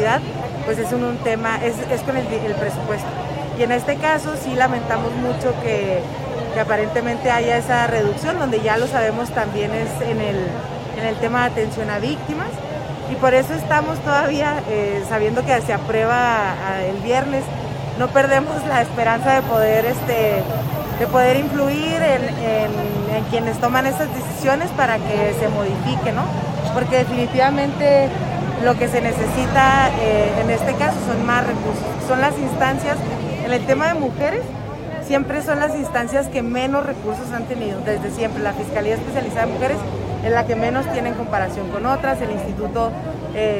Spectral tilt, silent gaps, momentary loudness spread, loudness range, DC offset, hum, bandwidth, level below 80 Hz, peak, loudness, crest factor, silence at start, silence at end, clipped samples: -6 dB/octave; none; 8 LU; 4 LU; under 0.1%; none; 16.5 kHz; -40 dBFS; 0 dBFS; -19 LUFS; 18 dB; 0 s; 0 s; under 0.1%